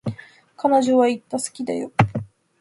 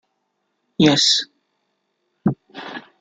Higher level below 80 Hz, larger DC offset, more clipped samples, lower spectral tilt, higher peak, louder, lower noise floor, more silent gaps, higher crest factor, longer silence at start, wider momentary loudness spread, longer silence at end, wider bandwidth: first, -52 dBFS vs -60 dBFS; neither; neither; first, -6 dB/octave vs -3.5 dB/octave; about the same, 0 dBFS vs -2 dBFS; second, -21 LUFS vs -17 LUFS; second, -45 dBFS vs -73 dBFS; neither; about the same, 22 dB vs 20 dB; second, 0.05 s vs 0.8 s; second, 15 LU vs 21 LU; first, 0.35 s vs 0.2 s; first, 11.5 kHz vs 9.4 kHz